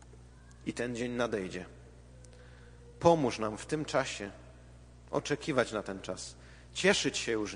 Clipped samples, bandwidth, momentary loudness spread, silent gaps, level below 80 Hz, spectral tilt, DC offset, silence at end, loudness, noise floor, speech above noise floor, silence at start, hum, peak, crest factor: under 0.1%; 10 kHz; 18 LU; none; -56 dBFS; -4 dB/octave; under 0.1%; 0 s; -33 LUFS; -54 dBFS; 22 dB; 0 s; none; -10 dBFS; 24 dB